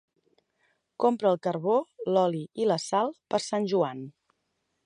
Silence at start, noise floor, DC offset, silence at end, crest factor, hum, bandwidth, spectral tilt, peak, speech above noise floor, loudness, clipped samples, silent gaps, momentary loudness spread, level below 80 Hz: 1 s; -78 dBFS; under 0.1%; 0.75 s; 18 dB; none; 11 kHz; -5.5 dB/octave; -10 dBFS; 51 dB; -27 LUFS; under 0.1%; none; 5 LU; -80 dBFS